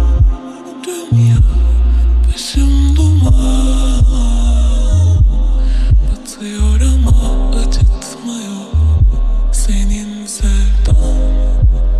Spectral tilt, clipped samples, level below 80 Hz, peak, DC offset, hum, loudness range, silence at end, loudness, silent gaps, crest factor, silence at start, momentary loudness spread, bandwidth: -6 dB/octave; under 0.1%; -12 dBFS; 0 dBFS; under 0.1%; none; 3 LU; 0 s; -14 LUFS; none; 10 dB; 0 s; 11 LU; 12 kHz